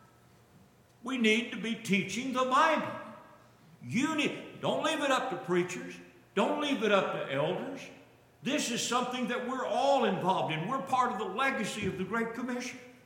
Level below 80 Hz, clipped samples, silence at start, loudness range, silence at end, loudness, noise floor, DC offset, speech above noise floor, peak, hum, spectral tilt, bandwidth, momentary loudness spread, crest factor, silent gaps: -74 dBFS; under 0.1%; 1.05 s; 2 LU; 0.15 s; -31 LUFS; -61 dBFS; under 0.1%; 30 dB; -12 dBFS; none; -4 dB/octave; 17 kHz; 13 LU; 18 dB; none